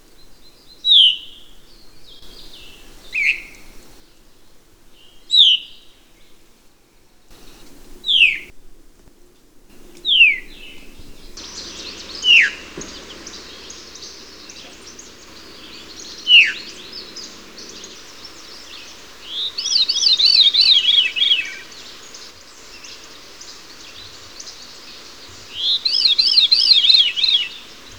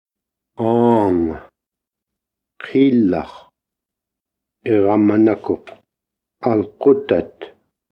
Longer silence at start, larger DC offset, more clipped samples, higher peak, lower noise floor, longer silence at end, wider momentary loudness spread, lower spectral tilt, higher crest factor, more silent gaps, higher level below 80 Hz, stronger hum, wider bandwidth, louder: second, 0.45 s vs 0.6 s; first, 0.4% vs under 0.1%; neither; about the same, 0 dBFS vs -2 dBFS; second, -51 dBFS vs -84 dBFS; about the same, 0.4 s vs 0.45 s; first, 27 LU vs 14 LU; second, 1.5 dB/octave vs -9.5 dB/octave; about the same, 20 dB vs 18 dB; neither; about the same, -50 dBFS vs -52 dBFS; neither; first, over 20 kHz vs 5.6 kHz; first, -12 LUFS vs -17 LUFS